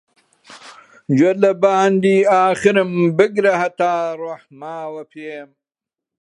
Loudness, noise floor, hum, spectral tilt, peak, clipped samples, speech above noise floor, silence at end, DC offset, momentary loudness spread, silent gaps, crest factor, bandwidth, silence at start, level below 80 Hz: -15 LUFS; -87 dBFS; none; -6.5 dB/octave; 0 dBFS; under 0.1%; 71 dB; 0.75 s; under 0.1%; 18 LU; none; 16 dB; 11 kHz; 0.5 s; -64 dBFS